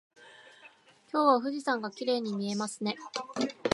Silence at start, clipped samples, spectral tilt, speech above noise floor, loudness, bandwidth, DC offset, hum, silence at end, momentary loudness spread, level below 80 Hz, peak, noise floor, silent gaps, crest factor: 0.2 s; under 0.1%; -4.5 dB/octave; 28 dB; -31 LUFS; 11.5 kHz; under 0.1%; none; 0 s; 11 LU; -84 dBFS; -10 dBFS; -58 dBFS; none; 22 dB